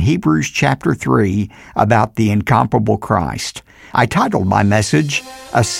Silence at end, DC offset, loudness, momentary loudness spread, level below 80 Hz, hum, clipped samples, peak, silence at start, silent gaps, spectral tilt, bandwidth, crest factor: 0 s; under 0.1%; -16 LUFS; 8 LU; -40 dBFS; none; under 0.1%; -2 dBFS; 0 s; none; -5.5 dB/octave; 16 kHz; 14 dB